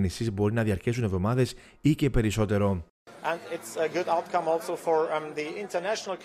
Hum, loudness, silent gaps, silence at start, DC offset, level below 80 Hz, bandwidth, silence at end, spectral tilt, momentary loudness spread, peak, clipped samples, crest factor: none; -28 LUFS; 2.90-3.06 s; 0 s; under 0.1%; -44 dBFS; 15 kHz; 0 s; -6.5 dB/octave; 7 LU; -10 dBFS; under 0.1%; 16 dB